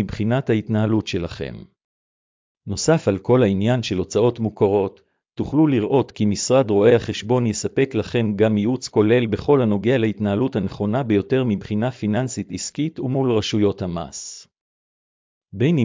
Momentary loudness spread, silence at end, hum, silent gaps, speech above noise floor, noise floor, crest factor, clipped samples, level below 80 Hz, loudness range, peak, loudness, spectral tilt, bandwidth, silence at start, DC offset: 11 LU; 0 s; none; 1.84-2.55 s, 14.61-15.41 s; over 71 dB; under -90 dBFS; 18 dB; under 0.1%; -46 dBFS; 4 LU; -4 dBFS; -20 LUFS; -6.5 dB/octave; 7.6 kHz; 0 s; under 0.1%